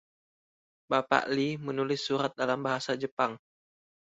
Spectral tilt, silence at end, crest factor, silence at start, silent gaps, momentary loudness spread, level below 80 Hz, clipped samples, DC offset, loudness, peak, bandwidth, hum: -5 dB/octave; 0.75 s; 26 dB; 0.9 s; 3.12-3.17 s; 6 LU; -74 dBFS; under 0.1%; under 0.1%; -30 LUFS; -6 dBFS; 8 kHz; none